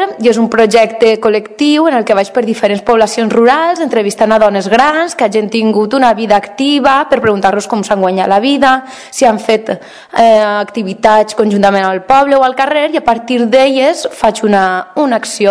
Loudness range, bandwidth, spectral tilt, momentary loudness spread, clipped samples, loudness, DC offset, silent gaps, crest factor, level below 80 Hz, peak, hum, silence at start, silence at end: 1 LU; 11 kHz; -4.5 dB/octave; 5 LU; 2%; -10 LUFS; under 0.1%; none; 10 dB; -46 dBFS; 0 dBFS; none; 0 s; 0 s